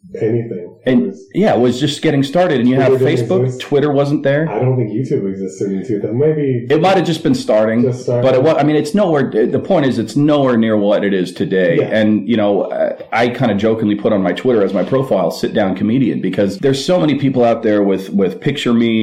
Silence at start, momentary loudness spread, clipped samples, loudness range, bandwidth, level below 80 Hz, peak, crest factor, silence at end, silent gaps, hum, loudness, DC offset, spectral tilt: 0.05 s; 5 LU; under 0.1%; 2 LU; 14 kHz; -54 dBFS; -2 dBFS; 12 dB; 0 s; none; none; -15 LUFS; under 0.1%; -7 dB/octave